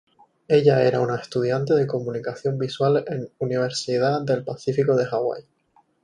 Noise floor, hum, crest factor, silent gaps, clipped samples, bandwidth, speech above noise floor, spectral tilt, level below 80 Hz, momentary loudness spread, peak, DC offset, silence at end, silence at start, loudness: -62 dBFS; none; 18 dB; none; under 0.1%; 10.5 kHz; 40 dB; -6.5 dB/octave; -64 dBFS; 9 LU; -4 dBFS; under 0.1%; 0.65 s; 0.5 s; -22 LUFS